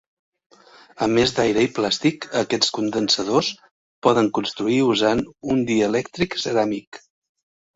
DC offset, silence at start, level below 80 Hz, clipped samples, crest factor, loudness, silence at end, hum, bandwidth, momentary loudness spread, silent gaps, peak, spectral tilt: under 0.1%; 1 s; -54 dBFS; under 0.1%; 20 dB; -21 LUFS; 0.8 s; none; 8 kHz; 7 LU; 3.71-4.02 s, 6.87-6.92 s; -2 dBFS; -4.5 dB/octave